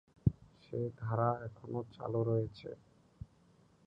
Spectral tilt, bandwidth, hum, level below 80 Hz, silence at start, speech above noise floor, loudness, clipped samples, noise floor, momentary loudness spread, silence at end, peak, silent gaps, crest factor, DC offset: -10.5 dB/octave; 5.8 kHz; none; -56 dBFS; 0.25 s; 30 dB; -37 LUFS; under 0.1%; -67 dBFS; 21 LU; 0.6 s; -14 dBFS; none; 24 dB; under 0.1%